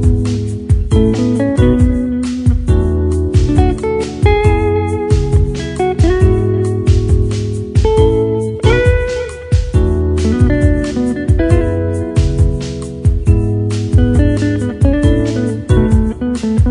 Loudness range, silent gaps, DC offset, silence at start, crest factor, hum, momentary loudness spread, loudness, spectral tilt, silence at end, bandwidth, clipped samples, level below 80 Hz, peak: 1 LU; none; under 0.1%; 0 s; 12 dB; none; 6 LU; -14 LUFS; -8 dB/octave; 0 s; 10.5 kHz; under 0.1%; -18 dBFS; 0 dBFS